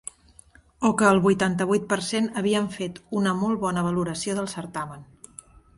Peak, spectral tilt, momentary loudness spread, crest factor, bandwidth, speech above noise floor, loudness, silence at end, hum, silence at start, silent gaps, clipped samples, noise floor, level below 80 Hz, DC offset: -4 dBFS; -5 dB/octave; 18 LU; 20 dB; 11.5 kHz; 31 dB; -24 LUFS; 0.75 s; none; 0.8 s; none; under 0.1%; -54 dBFS; -56 dBFS; under 0.1%